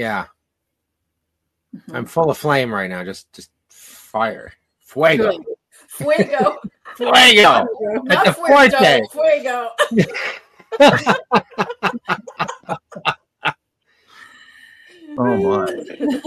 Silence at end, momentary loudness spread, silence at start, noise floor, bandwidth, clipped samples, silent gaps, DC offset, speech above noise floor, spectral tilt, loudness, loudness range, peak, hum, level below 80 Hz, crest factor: 0.05 s; 21 LU; 0 s; -77 dBFS; 13.5 kHz; under 0.1%; none; under 0.1%; 61 dB; -4 dB/octave; -15 LUFS; 11 LU; 0 dBFS; none; -58 dBFS; 18 dB